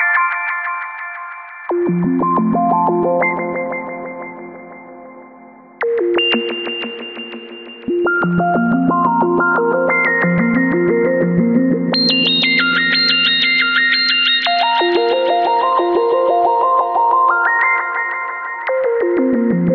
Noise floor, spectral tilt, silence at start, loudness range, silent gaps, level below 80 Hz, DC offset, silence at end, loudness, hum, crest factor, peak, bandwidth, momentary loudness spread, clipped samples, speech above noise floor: -41 dBFS; -7 dB/octave; 0 s; 9 LU; none; -56 dBFS; under 0.1%; 0 s; -14 LUFS; none; 14 dB; -2 dBFS; 6.6 kHz; 15 LU; under 0.1%; 25 dB